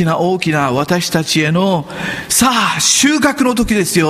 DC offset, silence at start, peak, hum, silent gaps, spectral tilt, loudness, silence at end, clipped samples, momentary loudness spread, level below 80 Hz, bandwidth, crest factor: under 0.1%; 0 s; 0 dBFS; none; none; -3.5 dB/octave; -13 LUFS; 0 s; under 0.1%; 6 LU; -38 dBFS; 15.5 kHz; 14 dB